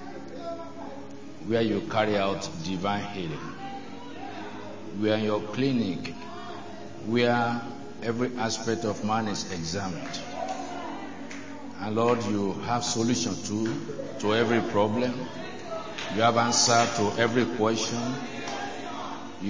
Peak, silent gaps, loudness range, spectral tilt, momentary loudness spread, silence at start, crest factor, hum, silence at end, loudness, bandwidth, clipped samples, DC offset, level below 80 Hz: -6 dBFS; none; 6 LU; -4 dB/octave; 15 LU; 0 s; 22 dB; none; 0 s; -28 LUFS; 7.6 kHz; under 0.1%; 0.8%; -58 dBFS